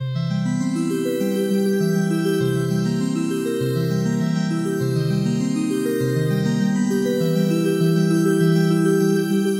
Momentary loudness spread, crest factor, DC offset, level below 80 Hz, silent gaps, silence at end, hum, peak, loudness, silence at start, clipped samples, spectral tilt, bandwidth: 5 LU; 12 dB; under 0.1%; -62 dBFS; none; 0 s; none; -6 dBFS; -20 LUFS; 0 s; under 0.1%; -7 dB/octave; 16 kHz